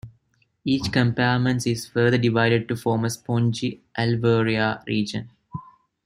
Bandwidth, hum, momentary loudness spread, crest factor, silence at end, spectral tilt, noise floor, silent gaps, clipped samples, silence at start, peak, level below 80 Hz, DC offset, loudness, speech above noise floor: 14.5 kHz; none; 12 LU; 18 dB; 0.45 s; -6 dB/octave; -66 dBFS; none; under 0.1%; 0.05 s; -6 dBFS; -56 dBFS; under 0.1%; -22 LUFS; 44 dB